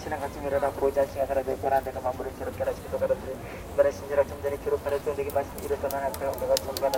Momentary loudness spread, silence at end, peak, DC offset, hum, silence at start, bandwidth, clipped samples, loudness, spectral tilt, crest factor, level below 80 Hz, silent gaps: 7 LU; 0 s; -6 dBFS; under 0.1%; none; 0 s; 17 kHz; under 0.1%; -29 LUFS; -5 dB/octave; 22 dB; -46 dBFS; none